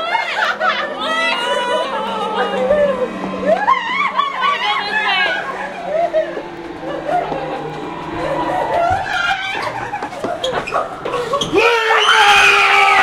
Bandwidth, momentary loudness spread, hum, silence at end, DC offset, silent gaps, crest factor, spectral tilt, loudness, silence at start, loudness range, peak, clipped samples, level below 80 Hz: 16 kHz; 15 LU; none; 0 s; under 0.1%; none; 16 dB; -2.5 dB/octave; -16 LUFS; 0 s; 6 LU; 0 dBFS; under 0.1%; -46 dBFS